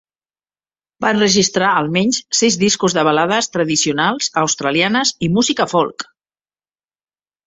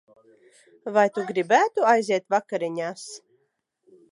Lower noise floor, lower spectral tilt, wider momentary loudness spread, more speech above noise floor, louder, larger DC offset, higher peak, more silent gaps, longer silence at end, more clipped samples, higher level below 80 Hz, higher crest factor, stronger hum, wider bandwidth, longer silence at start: first, under -90 dBFS vs -73 dBFS; about the same, -3 dB/octave vs -4 dB/octave; second, 5 LU vs 19 LU; first, over 74 dB vs 51 dB; first, -15 LUFS vs -23 LUFS; neither; first, 0 dBFS vs -4 dBFS; neither; first, 1.45 s vs 0.95 s; neither; first, -56 dBFS vs -82 dBFS; about the same, 18 dB vs 20 dB; first, 50 Hz at -45 dBFS vs none; second, 8.4 kHz vs 11.5 kHz; first, 1 s vs 0.85 s